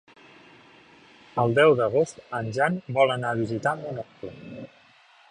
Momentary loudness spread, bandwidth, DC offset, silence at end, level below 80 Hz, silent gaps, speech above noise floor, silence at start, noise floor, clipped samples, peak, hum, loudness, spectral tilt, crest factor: 22 LU; 10.5 kHz; under 0.1%; 0.65 s; -64 dBFS; none; 32 dB; 1.35 s; -56 dBFS; under 0.1%; -6 dBFS; none; -24 LUFS; -6 dB/octave; 20 dB